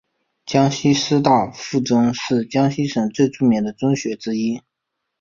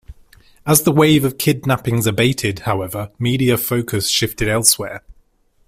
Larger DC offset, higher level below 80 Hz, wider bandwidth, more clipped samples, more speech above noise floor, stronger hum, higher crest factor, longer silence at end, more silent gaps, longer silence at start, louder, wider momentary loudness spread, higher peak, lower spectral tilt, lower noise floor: neither; second, -56 dBFS vs -42 dBFS; second, 7.4 kHz vs 16 kHz; neither; first, 60 dB vs 39 dB; neither; about the same, 18 dB vs 18 dB; about the same, 0.6 s vs 0.55 s; neither; first, 0.45 s vs 0.1 s; second, -19 LUFS vs -16 LUFS; about the same, 7 LU vs 9 LU; about the same, -2 dBFS vs 0 dBFS; first, -5.5 dB/octave vs -4 dB/octave; first, -78 dBFS vs -56 dBFS